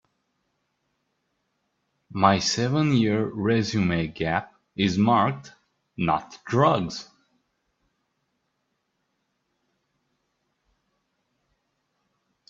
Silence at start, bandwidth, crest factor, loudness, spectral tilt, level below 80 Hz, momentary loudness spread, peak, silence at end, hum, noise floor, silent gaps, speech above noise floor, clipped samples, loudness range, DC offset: 2.15 s; 7.8 kHz; 24 dB; -23 LUFS; -5.5 dB/octave; -58 dBFS; 13 LU; -2 dBFS; 5.45 s; none; -76 dBFS; none; 53 dB; under 0.1%; 5 LU; under 0.1%